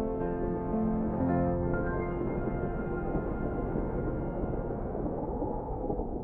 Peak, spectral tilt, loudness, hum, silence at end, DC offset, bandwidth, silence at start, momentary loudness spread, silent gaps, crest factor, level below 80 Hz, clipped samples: -16 dBFS; -12.5 dB/octave; -33 LUFS; none; 0 s; under 0.1%; 3.3 kHz; 0 s; 5 LU; none; 16 dB; -40 dBFS; under 0.1%